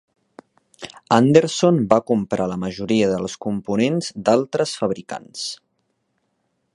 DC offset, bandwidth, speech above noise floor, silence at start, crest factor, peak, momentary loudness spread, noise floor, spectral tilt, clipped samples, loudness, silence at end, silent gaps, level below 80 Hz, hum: under 0.1%; 11.5 kHz; 52 dB; 0.8 s; 20 dB; 0 dBFS; 14 LU; -71 dBFS; -5.5 dB/octave; under 0.1%; -20 LUFS; 1.2 s; none; -56 dBFS; none